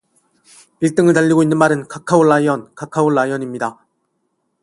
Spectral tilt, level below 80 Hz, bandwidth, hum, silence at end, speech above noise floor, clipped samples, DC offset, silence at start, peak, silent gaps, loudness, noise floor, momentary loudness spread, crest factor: -6.5 dB/octave; -60 dBFS; 11.5 kHz; none; 0.9 s; 54 dB; under 0.1%; under 0.1%; 0.8 s; 0 dBFS; none; -16 LUFS; -69 dBFS; 11 LU; 16 dB